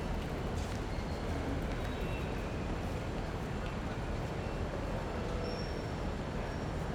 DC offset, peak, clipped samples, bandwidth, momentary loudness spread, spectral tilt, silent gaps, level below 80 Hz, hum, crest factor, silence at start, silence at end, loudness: under 0.1%; -24 dBFS; under 0.1%; 17.5 kHz; 1 LU; -6.5 dB/octave; none; -42 dBFS; none; 12 dB; 0 s; 0 s; -38 LUFS